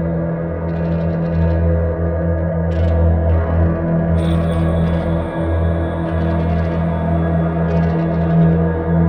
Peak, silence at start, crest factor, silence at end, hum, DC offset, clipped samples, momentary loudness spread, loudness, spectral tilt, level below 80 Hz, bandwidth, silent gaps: -4 dBFS; 0 s; 12 dB; 0 s; none; under 0.1%; under 0.1%; 4 LU; -17 LUFS; -10 dB/octave; -24 dBFS; 4.5 kHz; none